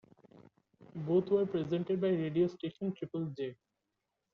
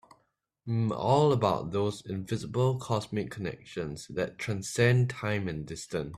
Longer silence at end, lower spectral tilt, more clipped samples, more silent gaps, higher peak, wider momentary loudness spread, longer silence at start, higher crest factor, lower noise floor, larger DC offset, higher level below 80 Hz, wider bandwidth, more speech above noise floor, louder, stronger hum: first, 0.8 s vs 0 s; first, -8 dB/octave vs -6 dB/octave; neither; neither; second, -18 dBFS vs -10 dBFS; about the same, 12 LU vs 13 LU; first, 0.8 s vs 0.65 s; about the same, 16 dB vs 20 dB; first, -86 dBFS vs -75 dBFS; neither; second, -74 dBFS vs -58 dBFS; second, 6.6 kHz vs 13.5 kHz; first, 53 dB vs 46 dB; second, -34 LUFS vs -30 LUFS; neither